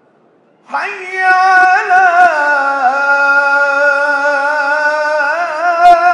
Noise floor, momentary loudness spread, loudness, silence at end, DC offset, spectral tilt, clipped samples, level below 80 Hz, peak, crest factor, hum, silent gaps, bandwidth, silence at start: -50 dBFS; 7 LU; -10 LUFS; 0 s; under 0.1%; -1.5 dB/octave; 0.6%; -54 dBFS; 0 dBFS; 12 dB; none; none; 10 kHz; 0.7 s